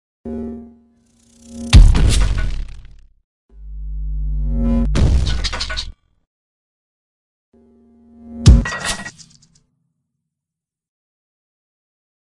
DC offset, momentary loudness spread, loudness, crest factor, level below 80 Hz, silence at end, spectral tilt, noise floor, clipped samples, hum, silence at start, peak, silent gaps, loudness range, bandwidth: under 0.1%; 22 LU; -17 LUFS; 18 dB; -20 dBFS; 1.35 s; -5 dB/octave; -86 dBFS; under 0.1%; none; 0.25 s; 0 dBFS; 3.24-3.49 s, 6.27-7.52 s; 5 LU; 11.5 kHz